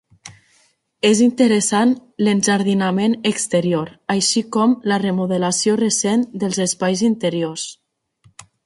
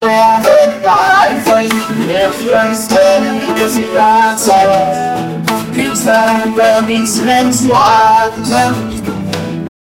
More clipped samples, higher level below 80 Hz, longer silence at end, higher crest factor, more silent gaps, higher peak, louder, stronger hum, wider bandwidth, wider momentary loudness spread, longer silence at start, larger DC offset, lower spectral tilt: neither; second, -62 dBFS vs -44 dBFS; first, 0.95 s vs 0.3 s; first, 16 dB vs 10 dB; neither; about the same, -2 dBFS vs 0 dBFS; second, -18 LUFS vs -10 LUFS; neither; second, 11.5 kHz vs 17 kHz; about the same, 7 LU vs 9 LU; first, 0.25 s vs 0 s; neither; about the same, -4 dB/octave vs -4 dB/octave